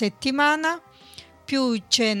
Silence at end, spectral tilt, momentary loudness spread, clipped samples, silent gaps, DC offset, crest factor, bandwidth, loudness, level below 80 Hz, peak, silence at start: 0 s; -2.5 dB/octave; 11 LU; under 0.1%; none; under 0.1%; 20 dB; 16 kHz; -22 LUFS; -62 dBFS; -4 dBFS; 0 s